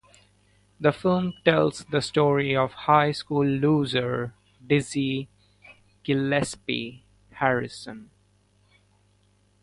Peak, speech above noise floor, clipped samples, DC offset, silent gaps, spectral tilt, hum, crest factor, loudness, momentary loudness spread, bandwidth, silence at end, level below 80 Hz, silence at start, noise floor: -4 dBFS; 40 dB; under 0.1%; under 0.1%; none; -6 dB/octave; 50 Hz at -55 dBFS; 22 dB; -24 LUFS; 15 LU; 11.5 kHz; 1.6 s; -58 dBFS; 0.8 s; -63 dBFS